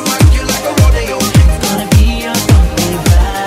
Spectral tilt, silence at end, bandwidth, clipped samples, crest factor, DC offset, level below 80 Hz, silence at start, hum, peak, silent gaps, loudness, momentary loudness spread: -5 dB/octave; 0 s; 16.5 kHz; 0.7%; 10 dB; under 0.1%; -12 dBFS; 0 s; none; 0 dBFS; none; -11 LUFS; 4 LU